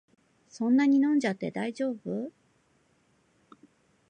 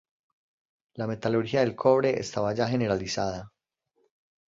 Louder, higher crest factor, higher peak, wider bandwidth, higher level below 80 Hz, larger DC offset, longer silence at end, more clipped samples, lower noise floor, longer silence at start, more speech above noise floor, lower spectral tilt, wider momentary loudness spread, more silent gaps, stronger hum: about the same, -28 LUFS vs -27 LUFS; about the same, 16 dB vs 20 dB; second, -14 dBFS vs -8 dBFS; first, 9.2 kHz vs 7.8 kHz; second, -80 dBFS vs -58 dBFS; neither; first, 1.8 s vs 1 s; neither; second, -68 dBFS vs -76 dBFS; second, 0.55 s vs 0.95 s; second, 42 dB vs 50 dB; about the same, -6.5 dB/octave vs -6 dB/octave; first, 13 LU vs 10 LU; neither; neither